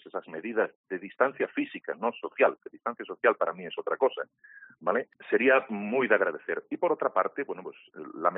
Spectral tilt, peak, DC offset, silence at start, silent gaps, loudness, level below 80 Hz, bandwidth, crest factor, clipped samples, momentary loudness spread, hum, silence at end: -3 dB/octave; -8 dBFS; under 0.1%; 0.05 s; 0.75-0.84 s; -29 LUFS; -80 dBFS; 3.9 kHz; 22 dB; under 0.1%; 13 LU; none; 0 s